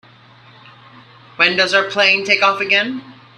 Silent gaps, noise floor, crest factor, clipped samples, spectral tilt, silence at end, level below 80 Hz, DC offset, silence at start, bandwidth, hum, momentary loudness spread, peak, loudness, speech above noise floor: none; -45 dBFS; 18 dB; under 0.1%; -2.5 dB/octave; 0.25 s; -66 dBFS; under 0.1%; 1.4 s; 11 kHz; none; 5 LU; 0 dBFS; -14 LUFS; 30 dB